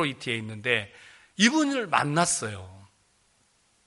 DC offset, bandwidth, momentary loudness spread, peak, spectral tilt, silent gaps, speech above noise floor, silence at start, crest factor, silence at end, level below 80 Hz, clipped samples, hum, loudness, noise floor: under 0.1%; 11.5 kHz; 18 LU; -4 dBFS; -3.5 dB/octave; none; 40 dB; 0 s; 24 dB; 1.05 s; -68 dBFS; under 0.1%; none; -25 LUFS; -66 dBFS